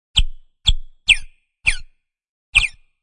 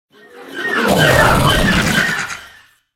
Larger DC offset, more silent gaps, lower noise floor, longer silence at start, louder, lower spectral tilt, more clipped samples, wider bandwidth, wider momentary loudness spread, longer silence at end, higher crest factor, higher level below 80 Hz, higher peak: neither; first, 2.29-2.53 s vs none; about the same, -44 dBFS vs -45 dBFS; second, 0.15 s vs 0.35 s; second, -18 LUFS vs -13 LUFS; second, 0 dB/octave vs -4 dB/octave; neither; second, 11 kHz vs 17 kHz; second, 8 LU vs 15 LU; second, 0.3 s vs 0.45 s; about the same, 20 dB vs 16 dB; about the same, -26 dBFS vs -28 dBFS; about the same, 0 dBFS vs 0 dBFS